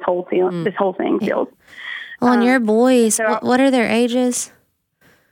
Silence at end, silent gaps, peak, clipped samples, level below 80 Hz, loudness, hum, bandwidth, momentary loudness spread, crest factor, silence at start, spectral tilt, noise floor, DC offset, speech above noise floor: 0.85 s; none; -2 dBFS; under 0.1%; -66 dBFS; -17 LUFS; none; 17 kHz; 15 LU; 16 dB; 0 s; -4 dB/octave; -60 dBFS; under 0.1%; 44 dB